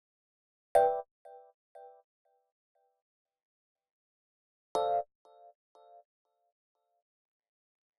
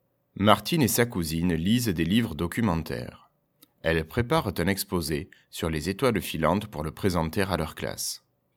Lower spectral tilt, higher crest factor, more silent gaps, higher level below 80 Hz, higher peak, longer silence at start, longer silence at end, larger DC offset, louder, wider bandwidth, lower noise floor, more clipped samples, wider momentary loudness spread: second, -3.5 dB/octave vs -5 dB/octave; about the same, 26 dB vs 26 dB; first, 1.11-1.25 s, 1.54-1.75 s, 2.04-2.25 s, 2.52-2.75 s, 3.02-3.25 s, 3.43-3.75 s, 3.91-4.75 s vs none; second, -76 dBFS vs -46 dBFS; second, -12 dBFS vs -2 dBFS; first, 0.75 s vs 0.35 s; first, 2.95 s vs 0.4 s; neither; second, -31 LUFS vs -27 LUFS; second, 12 kHz vs 18.5 kHz; first, under -90 dBFS vs -63 dBFS; neither; first, 26 LU vs 11 LU